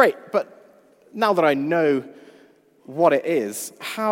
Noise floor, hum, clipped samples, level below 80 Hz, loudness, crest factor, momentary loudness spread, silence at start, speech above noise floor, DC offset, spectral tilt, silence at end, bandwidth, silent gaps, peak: -54 dBFS; none; under 0.1%; -78 dBFS; -21 LUFS; 20 dB; 17 LU; 0 s; 33 dB; under 0.1%; -4.5 dB/octave; 0 s; 16.5 kHz; none; -2 dBFS